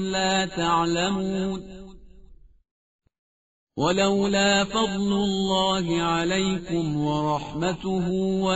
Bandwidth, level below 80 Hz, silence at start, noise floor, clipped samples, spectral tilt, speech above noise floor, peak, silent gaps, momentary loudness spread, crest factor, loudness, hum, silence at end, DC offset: 8 kHz; -48 dBFS; 0 s; -50 dBFS; under 0.1%; -4 dB/octave; 26 dB; -8 dBFS; 2.71-2.99 s, 3.18-3.67 s; 7 LU; 18 dB; -24 LUFS; none; 0 s; 0.2%